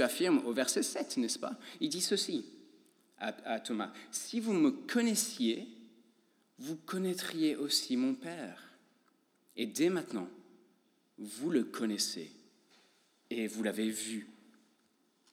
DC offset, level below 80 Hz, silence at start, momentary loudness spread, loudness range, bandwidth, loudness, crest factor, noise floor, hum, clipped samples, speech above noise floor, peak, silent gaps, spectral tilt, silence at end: under 0.1%; under -90 dBFS; 0 s; 14 LU; 4 LU; 18 kHz; -35 LUFS; 20 dB; -73 dBFS; none; under 0.1%; 39 dB; -16 dBFS; none; -3 dB/octave; 1 s